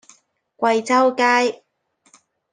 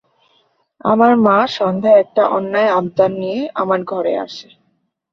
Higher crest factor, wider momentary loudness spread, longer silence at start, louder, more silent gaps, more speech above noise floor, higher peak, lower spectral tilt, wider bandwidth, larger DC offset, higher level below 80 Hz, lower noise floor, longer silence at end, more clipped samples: about the same, 18 dB vs 14 dB; about the same, 8 LU vs 10 LU; second, 0.6 s vs 0.85 s; second, -18 LUFS vs -15 LUFS; neither; second, 43 dB vs 51 dB; about the same, -4 dBFS vs -2 dBFS; second, -3 dB/octave vs -7 dB/octave; first, 9.8 kHz vs 6.8 kHz; neither; second, -74 dBFS vs -62 dBFS; second, -60 dBFS vs -65 dBFS; first, 1 s vs 0.7 s; neither